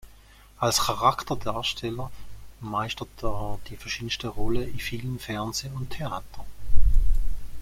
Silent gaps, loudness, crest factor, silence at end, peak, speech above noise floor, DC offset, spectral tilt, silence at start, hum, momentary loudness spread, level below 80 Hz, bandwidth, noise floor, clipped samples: none; -29 LUFS; 18 dB; 0 s; -4 dBFS; 24 dB; under 0.1%; -4 dB/octave; 0.05 s; none; 15 LU; -30 dBFS; 15.5 kHz; -51 dBFS; under 0.1%